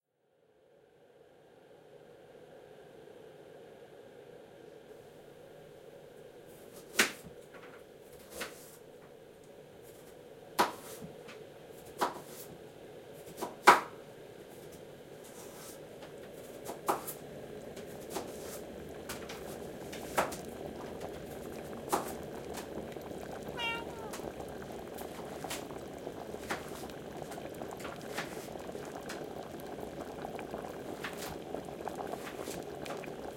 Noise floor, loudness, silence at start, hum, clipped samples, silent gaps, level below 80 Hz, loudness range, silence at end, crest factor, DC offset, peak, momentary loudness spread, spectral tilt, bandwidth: -72 dBFS; -38 LUFS; 0.6 s; none; under 0.1%; none; -64 dBFS; 20 LU; 0 s; 36 dB; under 0.1%; -4 dBFS; 19 LU; -3 dB/octave; 16.5 kHz